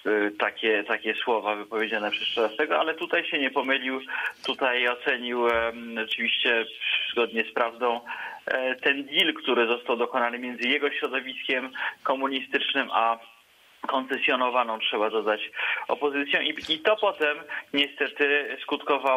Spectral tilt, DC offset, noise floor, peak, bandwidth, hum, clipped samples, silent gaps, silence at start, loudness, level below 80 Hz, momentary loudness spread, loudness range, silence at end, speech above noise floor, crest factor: -3.5 dB/octave; under 0.1%; -57 dBFS; -6 dBFS; 15.5 kHz; none; under 0.1%; none; 0.05 s; -26 LUFS; -68 dBFS; 6 LU; 1 LU; 0 s; 31 dB; 20 dB